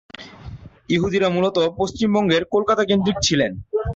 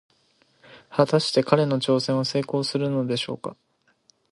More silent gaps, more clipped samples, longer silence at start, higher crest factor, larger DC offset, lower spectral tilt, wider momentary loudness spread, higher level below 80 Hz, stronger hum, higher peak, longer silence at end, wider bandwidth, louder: neither; neither; second, 0.2 s vs 0.7 s; second, 14 dB vs 22 dB; neither; about the same, -5 dB/octave vs -6 dB/octave; first, 19 LU vs 9 LU; first, -42 dBFS vs -68 dBFS; neither; second, -6 dBFS vs -2 dBFS; second, 0 s vs 0.8 s; second, 8 kHz vs 11.5 kHz; first, -19 LUFS vs -23 LUFS